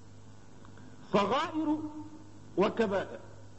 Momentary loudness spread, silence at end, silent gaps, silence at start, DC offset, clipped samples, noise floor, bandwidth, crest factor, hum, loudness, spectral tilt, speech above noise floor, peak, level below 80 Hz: 23 LU; 0 s; none; 0 s; 0.3%; under 0.1%; -54 dBFS; 8.4 kHz; 20 dB; none; -32 LUFS; -6 dB/octave; 23 dB; -14 dBFS; -64 dBFS